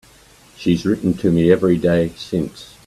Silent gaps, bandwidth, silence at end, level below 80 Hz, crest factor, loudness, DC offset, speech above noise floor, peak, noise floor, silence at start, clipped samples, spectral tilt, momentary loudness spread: none; 13 kHz; 0.2 s; -46 dBFS; 18 dB; -18 LUFS; under 0.1%; 31 dB; 0 dBFS; -48 dBFS; 0.6 s; under 0.1%; -7.5 dB/octave; 9 LU